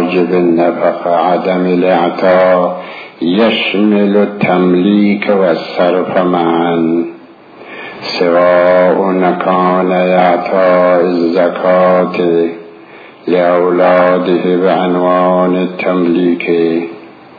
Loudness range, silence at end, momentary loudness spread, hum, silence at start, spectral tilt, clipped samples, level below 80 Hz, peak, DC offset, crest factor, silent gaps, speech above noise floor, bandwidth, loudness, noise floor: 2 LU; 0.25 s; 7 LU; none; 0 s; -8.5 dB/octave; under 0.1%; -58 dBFS; 0 dBFS; under 0.1%; 10 dB; none; 25 dB; 5 kHz; -11 LUFS; -35 dBFS